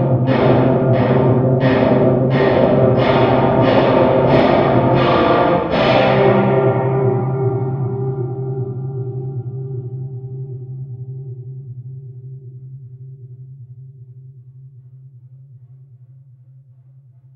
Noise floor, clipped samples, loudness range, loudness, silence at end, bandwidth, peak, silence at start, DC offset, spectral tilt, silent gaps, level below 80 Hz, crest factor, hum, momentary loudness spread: -45 dBFS; under 0.1%; 20 LU; -15 LUFS; 1.6 s; 5.8 kHz; 0 dBFS; 0 s; under 0.1%; -9.5 dB/octave; none; -42 dBFS; 16 dB; none; 21 LU